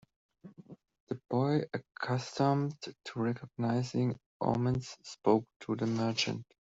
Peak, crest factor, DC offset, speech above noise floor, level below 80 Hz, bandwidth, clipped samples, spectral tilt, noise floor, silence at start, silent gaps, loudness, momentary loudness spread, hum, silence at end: -14 dBFS; 20 dB; under 0.1%; 21 dB; -66 dBFS; 8 kHz; under 0.1%; -6 dB/octave; -53 dBFS; 0.45 s; 1.00-1.07 s, 4.26-4.40 s, 5.56-5.60 s; -33 LUFS; 11 LU; none; 0.15 s